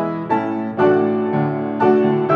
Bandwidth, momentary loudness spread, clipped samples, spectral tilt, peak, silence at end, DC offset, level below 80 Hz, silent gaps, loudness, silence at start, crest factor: 5.2 kHz; 5 LU; under 0.1%; -9.5 dB/octave; -2 dBFS; 0 s; under 0.1%; -64 dBFS; none; -18 LUFS; 0 s; 14 dB